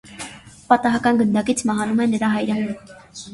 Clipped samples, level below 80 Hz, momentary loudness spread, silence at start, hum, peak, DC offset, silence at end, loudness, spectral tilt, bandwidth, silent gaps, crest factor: under 0.1%; -54 dBFS; 17 LU; 0.05 s; none; 0 dBFS; under 0.1%; 0 s; -19 LUFS; -5 dB/octave; 11.5 kHz; none; 20 dB